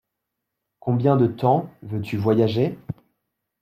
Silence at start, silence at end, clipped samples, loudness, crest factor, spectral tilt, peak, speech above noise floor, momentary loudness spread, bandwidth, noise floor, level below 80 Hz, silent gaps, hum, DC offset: 0.85 s; 0.7 s; under 0.1%; -22 LUFS; 18 dB; -9.5 dB/octave; -6 dBFS; 61 dB; 15 LU; 14 kHz; -81 dBFS; -60 dBFS; none; none; under 0.1%